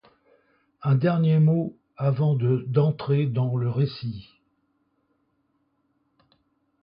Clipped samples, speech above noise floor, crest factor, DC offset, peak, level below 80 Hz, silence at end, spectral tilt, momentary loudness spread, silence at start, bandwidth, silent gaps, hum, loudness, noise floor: under 0.1%; 49 dB; 16 dB; under 0.1%; -10 dBFS; -62 dBFS; 2.6 s; -13 dB/octave; 12 LU; 0.8 s; 5.4 kHz; none; none; -24 LUFS; -71 dBFS